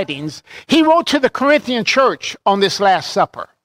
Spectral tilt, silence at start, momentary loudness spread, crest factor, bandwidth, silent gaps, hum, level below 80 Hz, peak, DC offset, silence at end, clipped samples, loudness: -4 dB/octave; 0 s; 10 LU; 14 dB; 16 kHz; none; none; -56 dBFS; -2 dBFS; under 0.1%; 0.2 s; under 0.1%; -15 LUFS